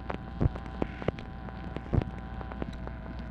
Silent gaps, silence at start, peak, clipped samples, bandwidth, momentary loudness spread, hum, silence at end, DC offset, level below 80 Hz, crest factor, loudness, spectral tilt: none; 0 s; -12 dBFS; under 0.1%; 8 kHz; 9 LU; none; 0 s; under 0.1%; -40 dBFS; 22 dB; -36 LUFS; -9 dB/octave